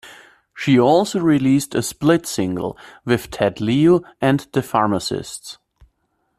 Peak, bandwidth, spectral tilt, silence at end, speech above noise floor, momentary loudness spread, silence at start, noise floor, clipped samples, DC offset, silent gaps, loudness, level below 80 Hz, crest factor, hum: -2 dBFS; 15 kHz; -5.5 dB/octave; 0.85 s; 50 dB; 12 LU; 0.05 s; -68 dBFS; under 0.1%; under 0.1%; none; -18 LUFS; -52 dBFS; 16 dB; none